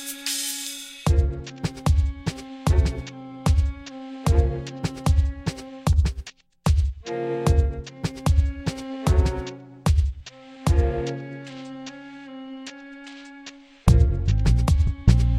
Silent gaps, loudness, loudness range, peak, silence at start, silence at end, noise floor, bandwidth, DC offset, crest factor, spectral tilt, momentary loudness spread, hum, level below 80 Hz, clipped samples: none; -24 LUFS; 3 LU; -2 dBFS; 0 s; 0 s; -45 dBFS; 16 kHz; under 0.1%; 20 dB; -6 dB/octave; 18 LU; none; -26 dBFS; under 0.1%